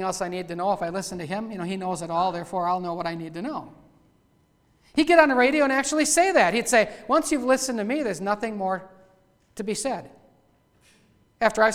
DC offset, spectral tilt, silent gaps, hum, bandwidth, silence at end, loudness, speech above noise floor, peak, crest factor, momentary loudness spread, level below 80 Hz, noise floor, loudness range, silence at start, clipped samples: under 0.1%; -3.5 dB/octave; none; none; 16.5 kHz; 0 s; -24 LUFS; 40 dB; -2 dBFS; 22 dB; 13 LU; -58 dBFS; -63 dBFS; 10 LU; 0 s; under 0.1%